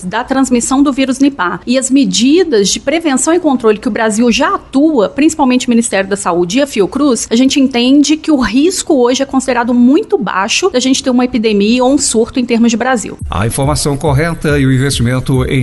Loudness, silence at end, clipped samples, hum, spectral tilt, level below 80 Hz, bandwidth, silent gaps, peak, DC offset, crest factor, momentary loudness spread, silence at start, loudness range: -11 LUFS; 0 s; under 0.1%; none; -4.5 dB/octave; -32 dBFS; 12 kHz; none; 0 dBFS; under 0.1%; 10 dB; 4 LU; 0 s; 1 LU